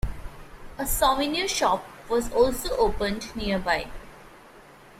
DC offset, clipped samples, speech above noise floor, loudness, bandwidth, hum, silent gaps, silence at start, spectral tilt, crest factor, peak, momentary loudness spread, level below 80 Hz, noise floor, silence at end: under 0.1%; under 0.1%; 25 dB; -25 LUFS; 16 kHz; none; none; 0.05 s; -3.5 dB/octave; 18 dB; -8 dBFS; 18 LU; -38 dBFS; -50 dBFS; 0.4 s